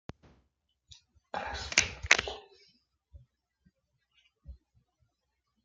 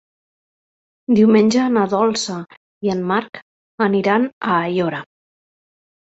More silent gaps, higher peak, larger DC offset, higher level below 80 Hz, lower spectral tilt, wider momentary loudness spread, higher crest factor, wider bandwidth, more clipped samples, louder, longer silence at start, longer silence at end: second, none vs 2.57-2.81 s, 3.42-3.78 s, 4.33-4.41 s; about the same, -2 dBFS vs -2 dBFS; neither; first, -56 dBFS vs -62 dBFS; second, -0.5 dB/octave vs -5.5 dB/octave; about the same, 19 LU vs 18 LU; first, 36 dB vs 16 dB; first, 10 kHz vs 8.2 kHz; neither; second, -29 LUFS vs -17 LUFS; first, 1.35 s vs 1.1 s; about the same, 1.1 s vs 1.1 s